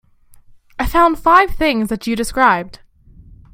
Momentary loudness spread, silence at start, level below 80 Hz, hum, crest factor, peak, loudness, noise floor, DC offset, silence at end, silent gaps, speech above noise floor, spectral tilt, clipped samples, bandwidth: 12 LU; 0.75 s; -32 dBFS; none; 16 dB; 0 dBFS; -15 LUFS; -46 dBFS; under 0.1%; 0.75 s; none; 31 dB; -4.5 dB/octave; under 0.1%; 16.5 kHz